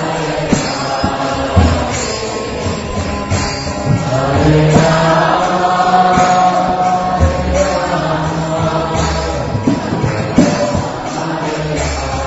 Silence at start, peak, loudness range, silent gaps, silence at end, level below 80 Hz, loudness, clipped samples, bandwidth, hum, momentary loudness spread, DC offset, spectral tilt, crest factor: 0 s; 0 dBFS; 5 LU; none; 0 s; -26 dBFS; -14 LUFS; under 0.1%; 8 kHz; none; 9 LU; under 0.1%; -5.5 dB/octave; 14 dB